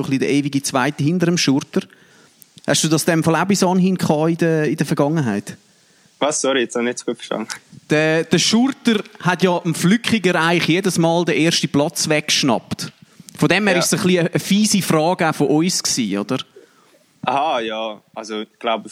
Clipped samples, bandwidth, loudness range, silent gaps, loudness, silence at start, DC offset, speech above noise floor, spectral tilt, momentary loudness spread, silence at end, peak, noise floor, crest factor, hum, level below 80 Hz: under 0.1%; 16 kHz; 4 LU; none; -18 LUFS; 0 s; under 0.1%; 36 dB; -4.5 dB/octave; 10 LU; 0 s; -2 dBFS; -54 dBFS; 18 dB; none; -62 dBFS